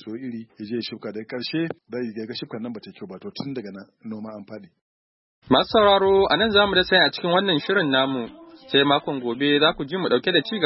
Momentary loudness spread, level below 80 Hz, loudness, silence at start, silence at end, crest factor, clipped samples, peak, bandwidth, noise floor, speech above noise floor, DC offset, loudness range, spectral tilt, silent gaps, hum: 19 LU; -54 dBFS; -21 LUFS; 0.05 s; 0 s; 20 dB; under 0.1%; -4 dBFS; 5.8 kHz; under -90 dBFS; over 68 dB; under 0.1%; 15 LU; -9 dB/octave; 4.81-5.42 s; none